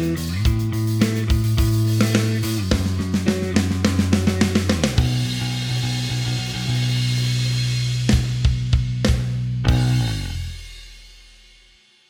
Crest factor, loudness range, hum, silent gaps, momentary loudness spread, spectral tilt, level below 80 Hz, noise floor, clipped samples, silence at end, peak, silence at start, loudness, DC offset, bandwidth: 20 dB; 2 LU; none; none; 5 LU; -5.5 dB/octave; -28 dBFS; -53 dBFS; under 0.1%; 0.95 s; 0 dBFS; 0 s; -21 LUFS; under 0.1%; over 20 kHz